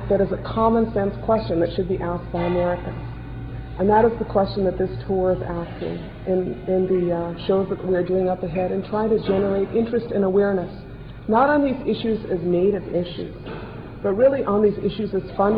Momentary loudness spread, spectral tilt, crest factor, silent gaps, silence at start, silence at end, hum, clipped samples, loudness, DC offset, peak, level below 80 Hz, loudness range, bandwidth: 14 LU; -10.5 dB/octave; 16 dB; none; 0 s; 0 s; none; under 0.1%; -22 LUFS; 0.2%; -6 dBFS; -40 dBFS; 2 LU; 5 kHz